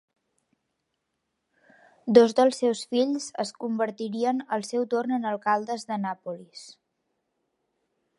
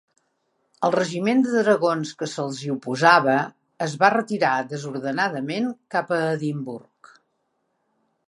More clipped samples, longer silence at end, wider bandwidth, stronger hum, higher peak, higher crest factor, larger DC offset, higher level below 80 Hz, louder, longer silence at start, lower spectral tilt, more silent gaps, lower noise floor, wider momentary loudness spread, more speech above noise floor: neither; about the same, 1.45 s vs 1.5 s; about the same, 11.5 kHz vs 11.5 kHz; neither; about the same, -2 dBFS vs -2 dBFS; about the same, 24 dB vs 22 dB; neither; about the same, -76 dBFS vs -74 dBFS; second, -25 LUFS vs -22 LUFS; first, 2.05 s vs 0.8 s; about the same, -5 dB/octave vs -5.5 dB/octave; neither; first, -80 dBFS vs -73 dBFS; first, 17 LU vs 12 LU; about the same, 54 dB vs 51 dB